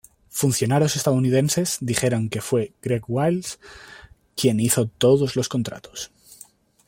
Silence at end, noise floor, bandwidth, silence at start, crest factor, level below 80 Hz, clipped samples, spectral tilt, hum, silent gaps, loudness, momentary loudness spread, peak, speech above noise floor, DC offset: 0.8 s; -50 dBFS; 16.5 kHz; 0.35 s; 18 dB; -56 dBFS; under 0.1%; -5 dB/octave; none; none; -22 LUFS; 16 LU; -4 dBFS; 29 dB; under 0.1%